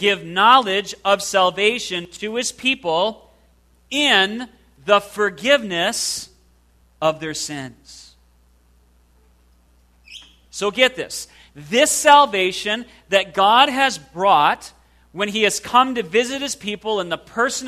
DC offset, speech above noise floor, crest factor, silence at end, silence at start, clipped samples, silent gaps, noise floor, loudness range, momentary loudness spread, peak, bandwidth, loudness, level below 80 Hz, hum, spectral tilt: under 0.1%; 37 dB; 20 dB; 0 s; 0 s; under 0.1%; none; -56 dBFS; 13 LU; 14 LU; 0 dBFS; 14 kHz; -18 LUFS; -56 dBFS; none; -2 dB/octave